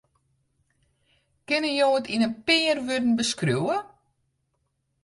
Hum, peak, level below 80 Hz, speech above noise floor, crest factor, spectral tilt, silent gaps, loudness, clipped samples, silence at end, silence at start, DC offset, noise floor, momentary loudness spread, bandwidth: none; -8 dBFS; -66 dBFS; 51 dB; 18 dB; -4 dB/octave; none; -24 LUFS; under 0.1%; 1.15 s; 1.5 s; under 0.1%; -75 dBFS; 6 LU; 11.5 kHz